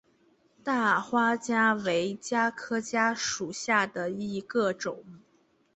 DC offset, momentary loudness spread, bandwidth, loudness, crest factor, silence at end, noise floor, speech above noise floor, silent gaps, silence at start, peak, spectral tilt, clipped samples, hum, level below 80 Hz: under 0.1%; 9 LU; 8.4 kHz; -28 LUFS; 18 dB; 0.6 s; -67 dBFS; 39 dB; none; 0.65 s; -10 dBFS; -3.5 dB/octave; under 0.1%; none; -72 dBFS